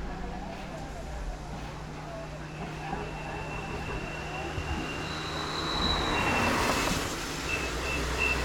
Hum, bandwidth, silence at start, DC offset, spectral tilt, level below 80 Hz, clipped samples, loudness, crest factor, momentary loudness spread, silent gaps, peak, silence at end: none; 19 kHz; 0 s; under 0.1%; -4 dB/octave; -40 dBFS; under 0.1%; -32 LUFS; 18 dB; 13 LU; none; -14 dBFS; 0 s